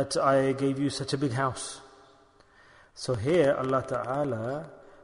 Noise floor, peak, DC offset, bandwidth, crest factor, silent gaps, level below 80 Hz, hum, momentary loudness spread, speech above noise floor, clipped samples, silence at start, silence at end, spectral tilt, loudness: -59 dBFS; -10 dBFS; under 0.1%; 11 kHz; 18 dB; none; -60 dBFS; none; 14 LU; 31 dB; under 0.1%; 0 s; 0.15 s; -5.5 dB/octave; -28 LUFS